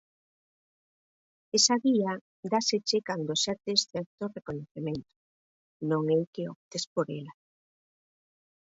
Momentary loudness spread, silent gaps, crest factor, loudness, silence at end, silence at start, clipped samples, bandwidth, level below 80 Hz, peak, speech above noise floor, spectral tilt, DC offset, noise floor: 15 LU; 2.21-2.43 s, 4.06-4.18 s, 4.71-4.75 s, 5.16-5.80 s, 6.27-6.33 s, 6.56-6.71 s, 6.87-6.96 s; 22 dB; -29 LUFS; 1.35 s; 1.55 s; under 0.1%; 8 kHz; -70 dBFS; -10 dBFS; over 61 dB; -3.5 dB/octave; under 0.1%; under -90 dBFS